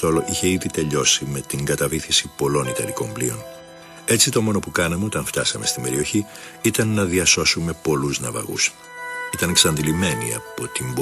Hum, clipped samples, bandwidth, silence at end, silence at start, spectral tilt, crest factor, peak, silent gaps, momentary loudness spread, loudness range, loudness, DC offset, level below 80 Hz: none; under 0.1%; 13 kHz; 0 s; 0 s; -3 dB/octave; 20 dB; -2 dBFS; none; 11 LU; 2 LU; -20 LUFS; under 0.1%; -46 dBFS